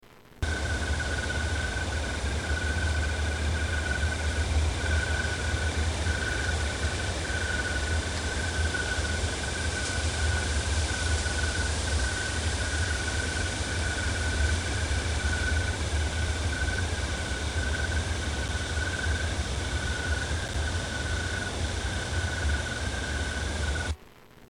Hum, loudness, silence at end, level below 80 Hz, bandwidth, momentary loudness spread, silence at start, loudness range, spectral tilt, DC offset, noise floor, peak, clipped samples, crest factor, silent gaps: none; -29 LUFS; 0.05 s; -32 dBFS; 11 kHz; 3 LU; 0.05 s; 2 LU; -3.5 dB/octave; under 0.1%; -52 dBFS; -14 dBFS; under 0.1%; 14 dB; none